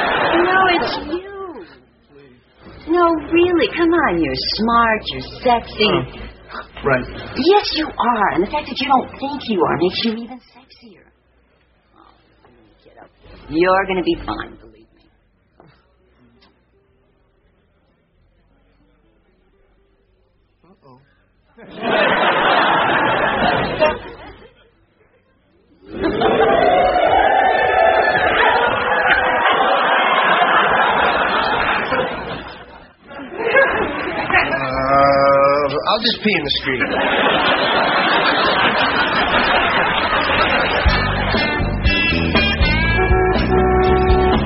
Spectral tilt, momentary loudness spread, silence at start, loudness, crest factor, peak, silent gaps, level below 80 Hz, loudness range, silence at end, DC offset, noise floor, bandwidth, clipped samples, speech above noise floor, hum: -2.5 dB/octave; 12 LU; 0 s; -16 LUFS; 16 dB; 0 dBFS; none; -32 dBFS; 8 LU; 0 s; under 0.1%; -59 dBFS; 6 kHz; under 0.1%; 42 dB; none